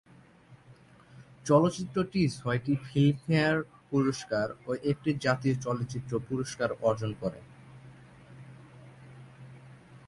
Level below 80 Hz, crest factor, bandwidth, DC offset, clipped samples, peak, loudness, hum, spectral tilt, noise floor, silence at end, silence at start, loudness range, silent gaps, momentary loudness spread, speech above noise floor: -60 dBFS; 20 dB; 11.5 kHz; under 0.1%; under 0.1%; -10 dBFS; -29 LUFS; none; -6.5 dB/octave; -56 dBFS; 0.1 s; 0.5 s; 8 LU; none; 24 LU; 28 dB